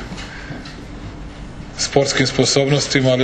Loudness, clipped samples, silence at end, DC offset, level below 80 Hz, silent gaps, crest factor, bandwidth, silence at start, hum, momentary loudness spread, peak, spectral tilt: -16 LUFS; under 0.1%; 0 s; under 0.1%; -38 dBFS; none; 20 dB; 9.2 kHz; 0 s; none; 19 LU; 0 dBFS; -4 dB/octave